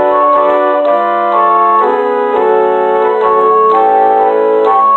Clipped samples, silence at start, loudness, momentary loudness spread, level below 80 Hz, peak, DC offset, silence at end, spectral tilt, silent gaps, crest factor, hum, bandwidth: under 0.1%; 0 s; -9 LUFS; 3 LU; -56 dBFS; 0 dBFS; under 0.1%; 0 s; -6.5 dB/octave; none; 8 dB; none; 4.3 kHz